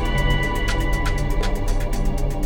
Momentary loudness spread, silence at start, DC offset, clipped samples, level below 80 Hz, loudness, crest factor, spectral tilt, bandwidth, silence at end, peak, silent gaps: 4 LU; 0 s; under 0.1%; under 0.1%; -22 dBFS; -24 LUFS; 12 dB; -5 dB/octave; 16.5 kHz; 0 s; -8 dBFS; none